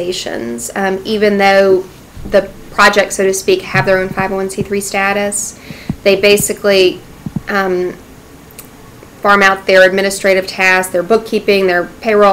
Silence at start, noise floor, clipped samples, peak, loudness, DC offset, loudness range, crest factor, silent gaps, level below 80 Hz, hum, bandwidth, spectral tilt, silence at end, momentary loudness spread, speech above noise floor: 0 s; -37 dBFS; under 0.1%; 0 dBFS; -12 LUFS; under 0.1%; 3 LU; 12 dB; none; -40 dBFS; none; 16 kHz; -3.5 dB/octave; 0 s; 12 LU; 25 dB